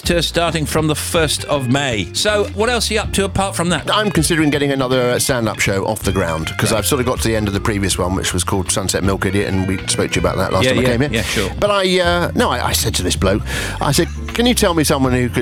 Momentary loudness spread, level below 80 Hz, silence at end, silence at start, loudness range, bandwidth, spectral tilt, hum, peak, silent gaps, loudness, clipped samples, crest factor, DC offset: 4 LU; -32 dBFS; 0 s; 0.05 s; 2 LU; 20 kHz; -4 dB/octave; none; 0 dBFS; none; -16 LUFS; under 0.1%; 16 dB; under 0.1%